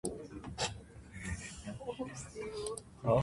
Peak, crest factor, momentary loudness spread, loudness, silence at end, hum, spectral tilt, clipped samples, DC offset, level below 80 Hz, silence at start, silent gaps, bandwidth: -18 dBFS; 20 dB; 8 LU; -41 LUFS; 0 s; none; -4.5 dB/octave; under 0.1%; under 0.1%; -54 dBFS; 0.05 s; none; 11.5 kHz